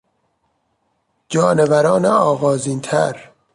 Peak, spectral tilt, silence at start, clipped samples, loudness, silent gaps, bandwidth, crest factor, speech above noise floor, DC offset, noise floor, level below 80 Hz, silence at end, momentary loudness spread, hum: -2 dBFS; -5.5 dB/octave; 1.3 s; under 0.1%; -16 LUFS; none; 11.5 kHz; 16 dB; 52 dB; under 0.1%; -67 dBFS; -58 dBFS; 0.3 s; 8 LU; none